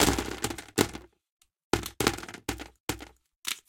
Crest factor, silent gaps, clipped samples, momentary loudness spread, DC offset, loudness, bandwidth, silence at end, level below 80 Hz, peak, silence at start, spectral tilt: 28 dB; 1.32-1.40 s, 1.64-1.71 s, 2.80-2.88 s, 3.36-3.43 s; under 0.1%; 11 LU; under 0.1%; -32 LUFS; 17 kHz; 0.1 s; -46 dBFS; -4 dBFS; 0 s; -3 dB/octave